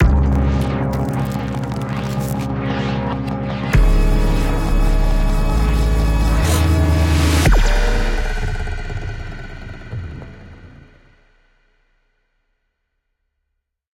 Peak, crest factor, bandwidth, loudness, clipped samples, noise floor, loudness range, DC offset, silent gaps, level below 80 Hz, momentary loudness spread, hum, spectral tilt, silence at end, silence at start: -2 dBFS; 16 dB; 16.5 kHz; -19 LUFS; under 0.1%; -74 dBFS; 17 LU; under 0.1%; none; -20 dBFS; 15 LU; none; -6 dB/octave; 3.3 s; 0 s